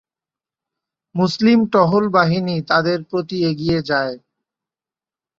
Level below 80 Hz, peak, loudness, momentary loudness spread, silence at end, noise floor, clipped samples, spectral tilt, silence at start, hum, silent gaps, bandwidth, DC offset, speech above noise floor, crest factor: -54 dBFS; -2 dBFS; -17 LUFS; 9 LU; 1.2 s; under -90 dBFS; under 0.1%; -7 dB/octave; 1.15 s; none; none; 7.6 kHz; under 0.1%; over 73 dB; 18 dB